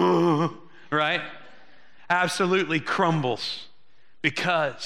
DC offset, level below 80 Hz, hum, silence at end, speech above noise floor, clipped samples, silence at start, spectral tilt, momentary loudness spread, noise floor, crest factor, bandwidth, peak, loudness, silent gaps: 0.5%; -72 dBFS; none; 0 s; 41 dB; under 0.1%; 0 s; -5 dB/octave; 8 LU; -65 dBFS; 20 dB; 13.5 kHz; -6 dBFS; -24 LUFS; none